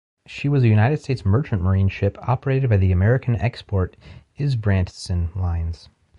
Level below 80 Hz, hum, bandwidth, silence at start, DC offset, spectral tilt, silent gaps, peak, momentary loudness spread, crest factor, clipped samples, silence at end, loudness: -32 dBFS; none; 10 kHz; 0.3 s; under 0.1%; -8 dB/octave; none; -8 dBFS; 10 LU; 14 dB; under 0.1%; 0.45 s; -21 LUFS